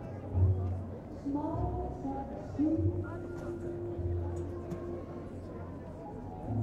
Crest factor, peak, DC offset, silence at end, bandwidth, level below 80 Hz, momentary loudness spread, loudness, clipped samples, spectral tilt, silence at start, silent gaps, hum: 18 dB; -18 dBFS; under 0.1%; 0 s; 7.2 kHz; -48 dBFS; 13 LU; -37 LUFS; under 0.1%; -10 dB/octave; 0 s; none; none